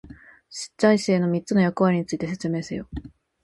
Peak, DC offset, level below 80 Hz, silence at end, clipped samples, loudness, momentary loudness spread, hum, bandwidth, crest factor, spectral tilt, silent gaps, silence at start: -6 dBFS; under 0.1%; -50 dBFS; 0.35 s; under 0.1%; -23 LUFS; 16 LU; none; 11.5 kHz; 18 dB; -6.5 dB/octave; none; 0.05 s